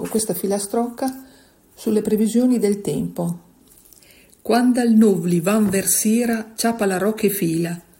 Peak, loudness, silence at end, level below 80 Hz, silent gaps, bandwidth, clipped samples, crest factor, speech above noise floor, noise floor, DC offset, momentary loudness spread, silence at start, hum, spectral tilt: -4 dBFS; -19 LUFS; 0.2 s; -58 dBFS; none; 16.5 kHz; under 0.1%; 16 dB; 32 dB; -51 dBFS; under 0.1%; 11 LU; 0 s; none; -5 dB/octave